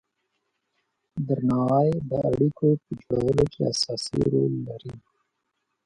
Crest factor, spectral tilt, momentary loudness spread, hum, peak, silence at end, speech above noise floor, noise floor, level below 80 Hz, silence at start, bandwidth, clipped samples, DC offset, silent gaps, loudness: 18 dB; -7 dB/octave; 12 LU; none; -8 dBFS; 0.85 s; 54 dB; -78 dBFS; -50 dBFS; 1.15 s; 11 kHz; under 0.1%; under 0.1%; none; -24 LUFS